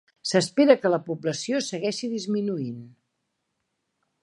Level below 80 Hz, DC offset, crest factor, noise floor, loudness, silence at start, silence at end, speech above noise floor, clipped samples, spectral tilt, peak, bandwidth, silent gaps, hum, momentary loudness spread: -74 dBFS; under 0.1%; 22 dB; -78 dBFS; -24 LUFS; 0.25 s; 1.35 s; 54 dB; under 0.1%; -4.5 dB/octave; -4 dBFS; 11.5 kHz; none; none; 11 LU